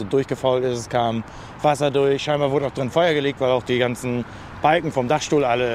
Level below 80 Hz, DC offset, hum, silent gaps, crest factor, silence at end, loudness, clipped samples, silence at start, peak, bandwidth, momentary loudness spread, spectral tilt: -50 dBFS; under 0.1%; none; none; 18 dB; 0 s; -21 LUFS; under 0.1%; 0 s; -4 dBFS; 14.5 kHz; 6 LU; -5.5 dB/octave